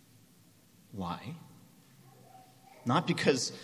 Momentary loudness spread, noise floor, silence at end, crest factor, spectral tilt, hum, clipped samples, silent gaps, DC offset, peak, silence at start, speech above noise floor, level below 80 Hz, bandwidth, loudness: 19 LU; -62 dBFS; 0 s; 24 dB; -4.5 dB/octave; none; under 0.1%; none; under 0.1%; -12 dBFS; 0.9 s; 30 dB; -66 dBFS; 15.5 kHz; -32 LUFS